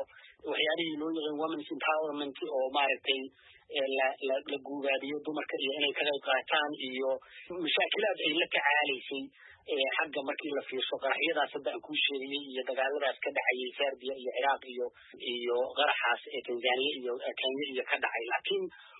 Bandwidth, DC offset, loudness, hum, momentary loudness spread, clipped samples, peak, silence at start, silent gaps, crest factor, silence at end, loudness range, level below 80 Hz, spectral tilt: 4 kHz; under 0.1%; -32 LUFS; none; 9 LU; under 0.1%; -12 dBFS; 0 s; none; 20 dB; 0 s; 2 LU; -84 dBFS; 1 dB/octave